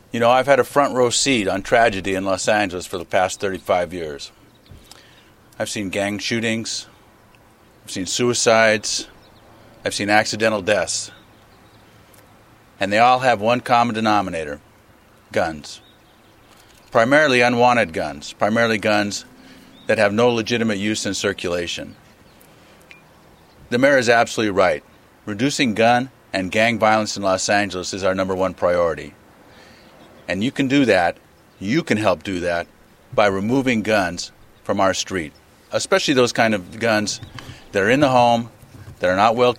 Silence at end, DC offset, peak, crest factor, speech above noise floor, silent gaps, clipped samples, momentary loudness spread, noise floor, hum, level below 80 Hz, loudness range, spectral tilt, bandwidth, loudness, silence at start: 0 s; under 0.1%; 0 dBFS; 20 dB; 32 dB; none; under 0.1%; 14 LU; -51 dBFS; none; -52 dBFS; 6 LU; -4 dB/octave; 16 kHz; -19 LUFS; 0.15 s